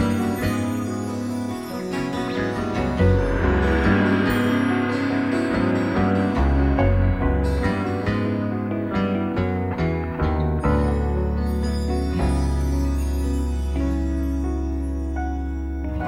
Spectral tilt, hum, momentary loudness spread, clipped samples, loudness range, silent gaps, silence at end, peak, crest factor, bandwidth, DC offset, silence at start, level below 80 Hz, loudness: -7.5 dB/octave; none; 7 LU; under 0.1%; 4 LU; none; 0 s; -6 dBFS; 14 dB; 16 kHz; under 0.1%; 0 s; -26 dBFS; -23 LUFS